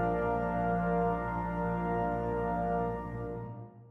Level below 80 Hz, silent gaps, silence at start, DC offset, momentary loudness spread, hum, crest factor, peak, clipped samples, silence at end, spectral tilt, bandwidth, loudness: -46 dBFS; none; 0 s; under 0.1%; 9 LU; none; 14 dB; -18 dBFS; under 0.1%; 0 s; -10 dB/octave; 3.9 kHz; -33 LUFS